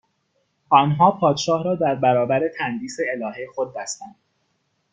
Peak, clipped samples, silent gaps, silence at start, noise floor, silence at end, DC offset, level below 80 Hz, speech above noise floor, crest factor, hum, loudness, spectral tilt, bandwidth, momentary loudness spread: 0 dBFS; under 0.1%; none; 0.7 s; -70 dBFS; 0.8 s; under 0.1%; -64 dBFS; 50 dB; 20 dB; none; -21 LUFS; -5.5 dB/octave; 9.4 kHz; 12 LU